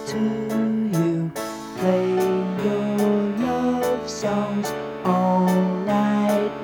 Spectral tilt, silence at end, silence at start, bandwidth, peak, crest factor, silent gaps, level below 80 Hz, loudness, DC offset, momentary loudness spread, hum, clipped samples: -6.5 dB/octave; 0 s; 0 s; 19.5 kHz; -6 dBFS; 14 dB; none; -58 dBFS; -22 LUFS; under 0.1%; 6 LU; none; under 0.1%